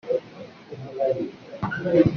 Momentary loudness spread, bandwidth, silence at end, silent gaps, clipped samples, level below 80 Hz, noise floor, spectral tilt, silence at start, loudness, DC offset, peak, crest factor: 19 LU; 6.4 kHz; 0 s; none; under 0.1%; -54 dBFS; -43 dBFS; -7 dB/octave; 0.05 s; -26 LUFS; under 0.1%; -4 dBFS; 20 dB